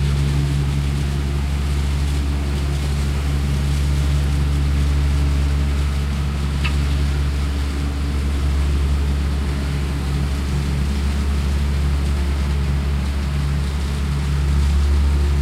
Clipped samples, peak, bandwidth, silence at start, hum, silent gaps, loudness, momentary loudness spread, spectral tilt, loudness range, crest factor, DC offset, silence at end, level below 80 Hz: under 0.1%; -8 dBFS; 13 kHz; 0 s; none; none; -21 LUFS; 3 LU; -6 dB/octave; 1 LU; 10 dB; under 0.1%; 0 s; -20 dBFS